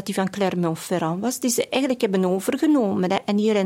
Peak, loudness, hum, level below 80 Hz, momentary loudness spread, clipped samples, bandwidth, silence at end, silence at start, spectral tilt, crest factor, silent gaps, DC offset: -6 dBFS; -22 LUFS; none; -66 dBFS; 5 LU; under 0.1%; 16.5 kHz; 0 s; 0 s; -5 dB/octave; 16 dB; none; under 0.1%